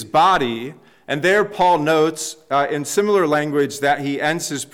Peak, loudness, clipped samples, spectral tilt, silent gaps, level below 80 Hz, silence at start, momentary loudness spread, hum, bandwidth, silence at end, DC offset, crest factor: -6 dBFS; -18 LUFS; under 0.1%; -4 dB/octave; none; -54 dBFS; 0 s; 9 LU; none; 16.5 kHz; 0.1 s; 0.1%; 12 dB